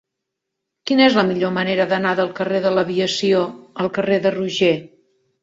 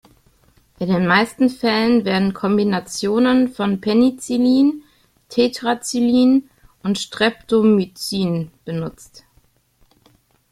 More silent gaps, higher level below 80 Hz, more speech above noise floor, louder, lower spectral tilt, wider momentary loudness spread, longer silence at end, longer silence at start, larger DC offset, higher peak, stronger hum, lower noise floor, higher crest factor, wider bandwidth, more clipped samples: neither; second, -62 dBFS vs -54 dBFS; first, 62 dB vs 41 dB; about the same, -18 LUFS vs -18 LUFS; about the same, -5 dB/octave vs -5.5 dB/octave; about the same, 9 LU vs 11 LU; second, 0.55 s vs 1.5 s; about the same, 0.85 s vs 0.8 s; neither; about the same, -2 dBFS vs -2 dBFS; neither; first, -80 dBFS vs -58 dBFS; about the same, 18 dB vs 18 dB; second, 8 kHz vs 14 kHz; neither